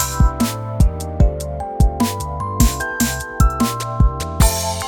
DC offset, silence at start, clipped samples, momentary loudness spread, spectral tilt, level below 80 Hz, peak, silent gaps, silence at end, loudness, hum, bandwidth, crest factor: under 0.1%; 0 s; under 0.1%; 4 LU; -5 dB/octave; -20 dBFS; 0 dBFS; none; 0 s; -19 LUFS; none; over 20 kHz; 16 dB